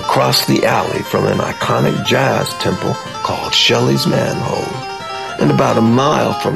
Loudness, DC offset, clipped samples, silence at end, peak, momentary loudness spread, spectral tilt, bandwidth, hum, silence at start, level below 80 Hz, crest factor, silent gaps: -15 LUFS; 0.2%; under 0.1%; 0 s; -2 dBFS; 9 LU; -5 dB/octave; 14 kHz; none; 0 s; -46 dBFS; 14 dB; none